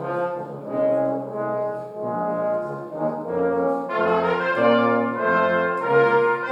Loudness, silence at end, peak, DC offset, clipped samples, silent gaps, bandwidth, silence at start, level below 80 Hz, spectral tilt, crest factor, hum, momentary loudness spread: -22 LUFS; 0 s; -6 dBFS; under 0.1%; under 0.1%; none; 7.4 kHz; 0 s; -66 dBFS; -7.5 dB/octave; 16 dB; none; 10 LU